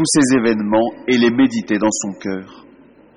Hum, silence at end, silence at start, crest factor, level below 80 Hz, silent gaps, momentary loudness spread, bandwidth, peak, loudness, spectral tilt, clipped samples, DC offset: none; 0.55 s; 0 s; 14 dB; -54 dBFS; none; 12 LU; 11 kHz; -2 dBFS; -16 LUFS; -4 dB/octave; under 0.1%; under 0.1%